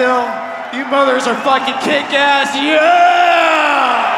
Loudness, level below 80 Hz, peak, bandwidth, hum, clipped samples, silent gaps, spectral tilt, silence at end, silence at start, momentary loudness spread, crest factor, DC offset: -12 LUFS; -60 dBFS; 0 dBFS; 13 kHz; none; under 0.1%; none; -2.5 dB/octave; 0 s; 0 s; 9 LU; 12 dB; under 0.1%